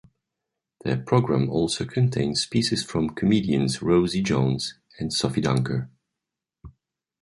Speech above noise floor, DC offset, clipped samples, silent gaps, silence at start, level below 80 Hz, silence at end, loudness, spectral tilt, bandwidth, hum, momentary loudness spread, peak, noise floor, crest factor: 63 dB; under 0.1%; under 0.1%; none; 0.85 s; -50 dBFS; 0.5 s; -24 LUFS; -5.5 dB/octave; 11.5 kHz; none; 8 LU; -6 dBFS; -86 dBFS; 20 dB